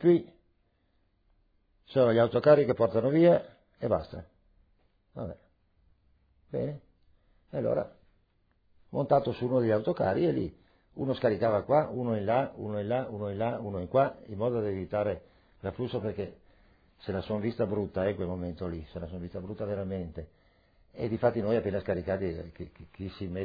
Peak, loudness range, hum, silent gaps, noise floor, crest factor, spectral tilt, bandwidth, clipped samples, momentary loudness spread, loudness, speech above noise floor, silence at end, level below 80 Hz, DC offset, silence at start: -10 dBFS; 12 LU; none; none; -71 dBFS; 22 dB; -7 dB/octave; 5 kHz; under 0.1%; 17 LU; -30 LUFS; 42 dB; 0 s; -58 dBFS; under 0.1%; 0 s